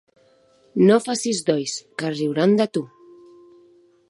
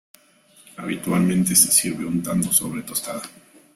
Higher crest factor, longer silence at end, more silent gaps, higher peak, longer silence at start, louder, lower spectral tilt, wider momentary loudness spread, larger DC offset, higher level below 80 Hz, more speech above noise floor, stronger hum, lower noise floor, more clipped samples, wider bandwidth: about the same, 18 dB vs 20 dB; first, 1.25 s vs 0.45 s; neither; about the same, -4 dBFS vs -2 dBFS; about the same, 0.75 s vs 0.8 s; about the same, -21 LUFS vs -19 LUFS; first, -5 dB/octave vs -3.5 dB/octave; second, 13 LU vs 18 LU; neither; second, -74 dBFS vs -56 dBFS; first, 37 dB vs 33 dB; neither; about the same, -57 dBFS vs -54 dBFS; neither; second, 11.5 kHz vs 16 kHz